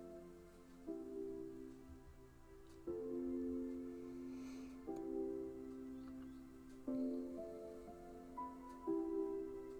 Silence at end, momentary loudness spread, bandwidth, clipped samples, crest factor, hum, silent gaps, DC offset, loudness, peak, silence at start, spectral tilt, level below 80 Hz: 0 s; 16 LU; 19.5 kHz; under 0.1%; 16 dB; none; none; under 0.1%; -48 LUFS; -32 dBFS; 0 s; -7.5 dB/octave; -66 dBFS